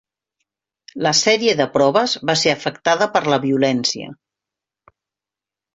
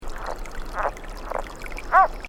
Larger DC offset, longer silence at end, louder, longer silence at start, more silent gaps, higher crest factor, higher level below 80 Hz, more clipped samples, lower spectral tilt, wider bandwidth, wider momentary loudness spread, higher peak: neither; first, 1.6 s vs 0 s; first, -17 LUFS vs -26 LUFS; first, 0.95 s vs 0 s; neither; about the same, 18 dB vs 20 dB; second, -60 dBFS vs -34 dBFS; neither; about the same, -3.5 dB/octave vs -4 dB/octave; second, 8.2 kHz vs 16 kHz; second, 7 LU vs 17 LU; about the same, -2 dBFS vs -4 dBFS